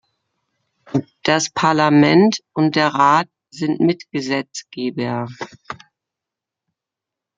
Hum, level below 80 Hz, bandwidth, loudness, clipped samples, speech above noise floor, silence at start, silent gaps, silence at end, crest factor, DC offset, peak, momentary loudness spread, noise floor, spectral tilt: none; -62 dBFS; 7.8 kHz; -17 LUFS; under 0.1%; 69 dB; 0.95 s; none; 1.65 s; 18 dB; under 0.1%; -2 dBFS; 18 LU; -85 dBFS; -5 dB/octave